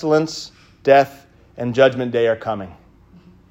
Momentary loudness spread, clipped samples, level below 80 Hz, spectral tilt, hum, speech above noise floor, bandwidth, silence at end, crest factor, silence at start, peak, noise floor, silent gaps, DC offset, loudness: 16 LU; under 0.1%; -56 dBFS; -5.5 dB/octave; none; 30 dB; 16 kHz; 0.75 s; 18 dB; 0 s; 0 dBFS; -48 dBFS; none; under 0.1%; -18 LUFS